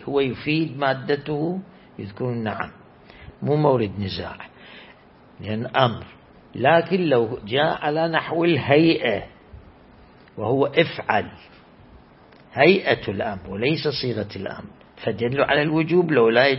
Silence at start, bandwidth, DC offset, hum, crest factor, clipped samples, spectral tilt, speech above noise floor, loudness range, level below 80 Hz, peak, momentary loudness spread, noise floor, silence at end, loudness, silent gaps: 0 s; 5.8 kHz; under 0.1%; none; 20 dB; under 0.1%; -10.5 dB/octave; 29 dB; 6 LU; -54 dBFS; -2 dBFS; 19 LU; -50 dBFS; 0 s; -21 LUFS; none